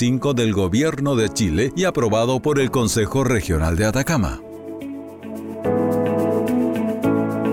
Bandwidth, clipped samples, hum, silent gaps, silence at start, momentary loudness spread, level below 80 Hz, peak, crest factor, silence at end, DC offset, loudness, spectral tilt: 17 kHz; under 0.1%; none; none; 0 s; 13 LU; -36 dBFS; -8 dBFS; 12 dB; 0 s; under 0.1%; -20 LUFS; -5.5 dB/octave